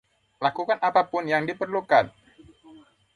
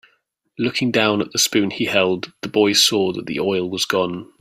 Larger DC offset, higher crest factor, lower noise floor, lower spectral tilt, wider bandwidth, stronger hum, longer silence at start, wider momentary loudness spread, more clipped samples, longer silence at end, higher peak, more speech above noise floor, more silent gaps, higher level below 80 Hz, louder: neither; about the same, 20 dB vs 18 dB; second, -52 dBFS vs -65 dBFS; first, -6 dB/octave vs -3 dB/octave; second, 11 kHz vs 16 kHz; neither; second, 0.4 s vs 0.6 s; about the same, 7 LU vs 9 LU; neither; first, 0.4 s vs 0.15 s; second, -6 dBFS vs -2 dBFS; second, 29 dB vs 46 dB; neither; second, -66 dBFS vs -60 dBFS; second, -24 LUFS vs -18 LUFS